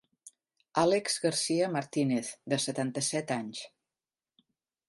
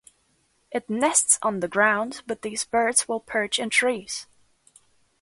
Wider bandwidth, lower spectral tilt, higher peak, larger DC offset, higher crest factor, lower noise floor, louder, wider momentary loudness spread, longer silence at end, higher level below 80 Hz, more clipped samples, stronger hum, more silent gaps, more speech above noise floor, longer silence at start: about the same, 12 kHz vs 12 kHz; first, -4 dB/octave vs -1.5 dB/octave; second, -12 dBFS vs -4 dBFS; neither; about the same, 22 dB vs 20 dB; first, under -90 dBFS vs -67 dBFS; second, -30 LUFS vs -23 LUFS; second, 8 LU vs 13 LU; first, 1.2 s vs 1 s; second, -78 dBFS vs -66 dBFS; neither; neither; neither; first, over 60 dB vs 43 dB; second, 0.25 s vs 0.7 s